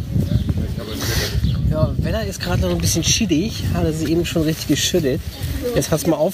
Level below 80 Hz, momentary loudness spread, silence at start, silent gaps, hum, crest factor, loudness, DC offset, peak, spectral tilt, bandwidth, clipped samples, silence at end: -28 dBFS; 6 LU; 0 s; none; none; 16 dB; -20 LUFS; under 0.1%; -4 dBFS; -5 dB/octave; 15.5 kHz; under 0.1%; 0 s